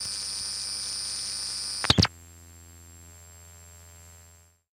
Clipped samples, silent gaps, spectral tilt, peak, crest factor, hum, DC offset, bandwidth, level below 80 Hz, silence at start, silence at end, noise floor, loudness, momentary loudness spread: under 0.1%; none; -2.5 dB/octave; -2 dBFS; 30 dB; 50 Hz at -55 dBFS; under 0.1%; 16 kHz; -48 dBFS; 0 s; 0.45 s; -56 dBFS; -27 LUFS; 27 LU